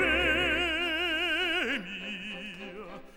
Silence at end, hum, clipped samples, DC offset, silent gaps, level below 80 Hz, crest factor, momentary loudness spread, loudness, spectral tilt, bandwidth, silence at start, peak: 0 s; none; under 0.1%; under 0.1%; none; -48 dBFS; 16 dB; 16 LU; -28 LUFS; -3.5 dB/octave; over 20 kHz; 0 s; -14 dBFS